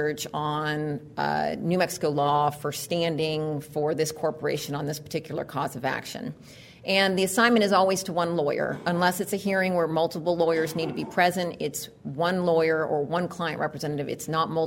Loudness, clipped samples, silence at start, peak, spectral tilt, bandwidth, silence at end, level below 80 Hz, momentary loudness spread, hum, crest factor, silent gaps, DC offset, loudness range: -26 LUFS; under 0.1%; 0 s; -6 dBFS; -4.5 dB/octave; 16.5 kHz; 0 s; -62 dBFS; 9 LU; none; 20 dB; none; under 0.1%; 5 LU